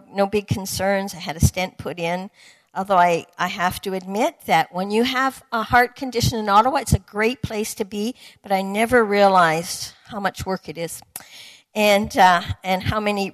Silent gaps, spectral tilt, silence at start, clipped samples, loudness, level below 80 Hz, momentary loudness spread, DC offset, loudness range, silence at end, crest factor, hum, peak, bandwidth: none; -4.5 dB/octave; 0.1 s; under 0.1%; -20 LUFS; -42 dBFS; 14 LU; under 0.1%; 3 LU; 0 s; 16 dB; none; -4 dBFS; 14 kHz